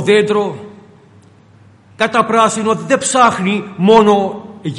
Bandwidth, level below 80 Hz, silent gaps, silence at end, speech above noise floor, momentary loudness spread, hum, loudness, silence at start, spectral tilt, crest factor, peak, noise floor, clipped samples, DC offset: 11.5 kHz; -54 dBFS; none; 0 s; 32 dB; 12 LU; none; -13 LUFS; 0 s; -4.5 dB/octave; 14 dB; 0 dBFS; -45 dBFS; under 0.1%; under 0.1%